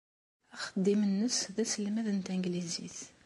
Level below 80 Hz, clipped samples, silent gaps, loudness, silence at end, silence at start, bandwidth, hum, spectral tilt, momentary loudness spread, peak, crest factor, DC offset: -76 dBFS; under 0.1%; none; -33 LUFS; 0.15 s; 0.55 s; 11.5 kHz; none; -4.5 dB/octave; 11 LU; -18 dBFS; 16 dB; under 0.1%